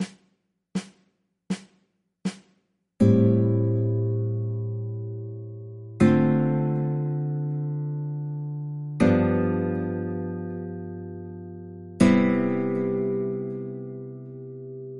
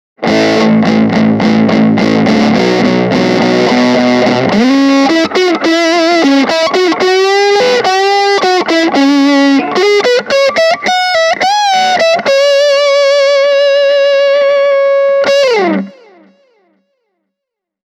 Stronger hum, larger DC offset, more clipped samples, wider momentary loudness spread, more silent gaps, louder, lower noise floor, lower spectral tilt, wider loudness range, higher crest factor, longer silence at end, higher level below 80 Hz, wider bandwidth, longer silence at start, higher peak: neither; neither; neither; first, 19 LU vs 2 LU; neither; second, -25 LUFS vs -9 LUFS; second, -71 dBFS vs -79 dBFS; first, -8.5 dB/octave vs -4.5 dB/octave; about the same, 2 LU vs 1 LU; first, 20 dB vs 10 dB; second, 0 s vs 2 s; second, -58 dBFS vs -50 dBFS; second, 11.5 kHz vs 15 kHz; second, 0 s vs 0.2 s; second, -4 dBFS vs 0 dBFS